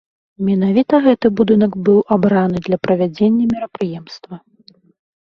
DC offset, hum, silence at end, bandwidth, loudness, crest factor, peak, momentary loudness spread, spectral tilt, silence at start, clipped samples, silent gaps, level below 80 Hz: under 0.1%; none; 0.85 s; 6.4 kHz; -15 LUFS; 14 dB; -2 dBFS; 11 LU; -9 dB/octave; 0.4 s; under 0.1%; none; -52 dBFS